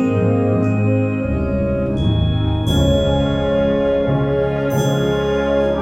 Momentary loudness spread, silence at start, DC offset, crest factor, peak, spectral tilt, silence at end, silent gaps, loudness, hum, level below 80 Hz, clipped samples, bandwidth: 3 LU; 0 s; under 0.1%; 12 dB; -4 dBFS; -7.5 dB/octave; 0 s; none; -17 LUFS; none; -30 dBFS; under 0.1%; 15 kHz